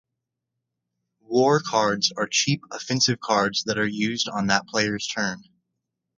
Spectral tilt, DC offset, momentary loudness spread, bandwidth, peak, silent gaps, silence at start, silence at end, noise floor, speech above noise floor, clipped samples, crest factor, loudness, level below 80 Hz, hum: -3.5 dB/octave; under 0.1%; 7 LU; 9.4 kHz; -2 dBFS; none; 1.3 s; 0.75 s; -83 dBFS; 60 dB; under 0.1%; 22 dB; -23 LUFS; -62 dBFS; none